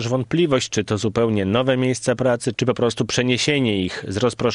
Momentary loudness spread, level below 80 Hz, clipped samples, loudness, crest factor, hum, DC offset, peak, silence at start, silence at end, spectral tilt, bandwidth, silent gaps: 4 LU; -52 dBFS; under 0.1%; -20 LUFS; 16 dB; none; under 0.1%; -4 dBFS; 0 s; 0 s; -5 dB/octave; 11 kHz; none